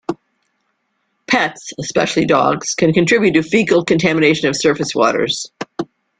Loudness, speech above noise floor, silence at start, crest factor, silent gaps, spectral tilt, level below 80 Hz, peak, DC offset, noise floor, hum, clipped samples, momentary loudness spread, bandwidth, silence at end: -15 LUFS; 53 dB; 0.1 s; 16 dB; none; -4.5 dB/octave; -52 dBFS; -2 dBFS; under 0.1%; -68 dBFS; none; under 0.1%; 14 LU; 9.6 kHz; 0.35 s